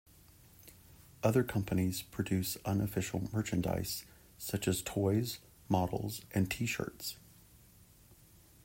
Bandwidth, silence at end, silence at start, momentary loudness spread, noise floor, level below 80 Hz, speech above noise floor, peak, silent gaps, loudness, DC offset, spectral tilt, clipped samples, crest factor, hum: 16.5 kHz; 0.5 s; 0.65 s; 11 LU; -61 dBFS; -60 dBFS; 27 dB; -16 dBFS; none; -35 LUFS; under 0.1%; -5.5 dB/octave; under 0.1%; 20 dB; none